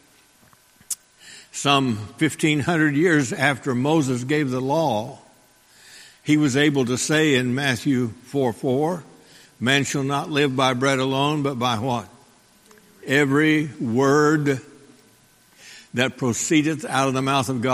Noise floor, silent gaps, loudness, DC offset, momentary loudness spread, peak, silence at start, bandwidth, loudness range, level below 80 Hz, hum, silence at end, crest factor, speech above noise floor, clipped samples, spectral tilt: -55 dBFS; none; -21 LUFS; under 0.1%; 9 LU; -2 dBFS; 0.9 s; 15 kHz; 2 LU; -60 dBFS; none; 0 s; 20 dB; 35 dB; under 0.1%; -4.5 dB/octave